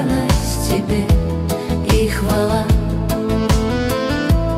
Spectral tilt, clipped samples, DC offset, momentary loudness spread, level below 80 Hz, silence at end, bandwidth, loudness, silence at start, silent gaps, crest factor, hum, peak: -6 dB/octave; under 0.1%; under 0.1%; 4 LU; -22 dBFS; 0 s; 16 kHz; -18 LUFS; 0 s; none; 12 dB; none; -4 dBFS